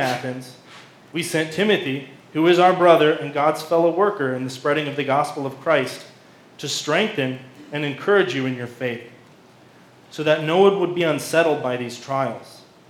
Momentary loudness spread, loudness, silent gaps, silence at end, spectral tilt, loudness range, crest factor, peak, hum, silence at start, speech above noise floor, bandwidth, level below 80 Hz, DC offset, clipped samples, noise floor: 15 LU; -20 LUFS; none; 0.3 s; -5 dB/octave; 5 LU; 20 dB; 0 dBFS; none; 0 s; 29 dB; 16.5 kHz; -76 dBFS; under 0.1%; under 0.1%; -49 dBFS